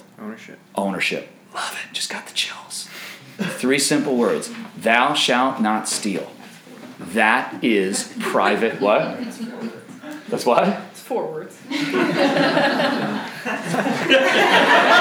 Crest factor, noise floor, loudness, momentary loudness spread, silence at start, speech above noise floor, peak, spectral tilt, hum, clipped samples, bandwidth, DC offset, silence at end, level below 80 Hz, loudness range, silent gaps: 20 dB; -40 dBFS; -19 LUFS; 18 LU; 0.2 s; 21 dB; -2 dBFS; -3.5 dB/octave; none; under 0.1%; over 20 kHz; under 0.1%; 0 s; -74 dBFS; 4 LU; none